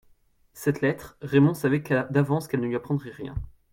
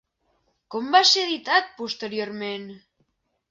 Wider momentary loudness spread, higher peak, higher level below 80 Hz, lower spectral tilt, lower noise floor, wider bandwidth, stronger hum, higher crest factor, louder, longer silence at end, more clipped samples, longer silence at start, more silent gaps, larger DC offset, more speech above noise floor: second, 15 LU vs 18 LU; second, -8 dBFS vs -4 dBFS; first, -48 dBFS vs -74 dBFS; first, -7.5 dB/octave vs -1.5 dB/octave; second, -61 dBFS vs -71 dBFS; first, 17 kHz vs 7.8 kHz; neither; about the same, 18 dB vs 20 dB; second, -25 LUFS vs -22 LUFS; second, 0.25 s vs 0.75 s; neither; second, 0.55 s vs 0.7 s; neither; neither; second, 36 dB vs 48 dB